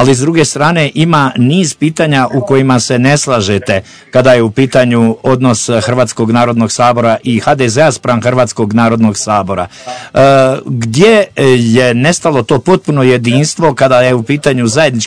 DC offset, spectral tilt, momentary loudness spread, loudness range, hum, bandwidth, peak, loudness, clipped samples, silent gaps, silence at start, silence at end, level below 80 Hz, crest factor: 0.7%; -5.5 dB/octave; 5 LU; 1 LU; none; 11 kHz; 0 dBFS; -9 LUFS; 3%; none; 0 s; 0 s; -44 dBFS; 10 dB